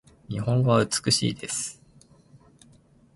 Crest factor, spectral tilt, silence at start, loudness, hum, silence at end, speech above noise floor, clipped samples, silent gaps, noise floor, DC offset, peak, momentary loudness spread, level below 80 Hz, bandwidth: 18 dB; -4.5 dB/octave; 0.3 s; -25 LUFS; none; 1.45 s; 33 dB; under 0.1%; none; -57 dBFS; under 0.1%; -8 dBFS; 11 LU; -56 dBFS; 11.5 kHz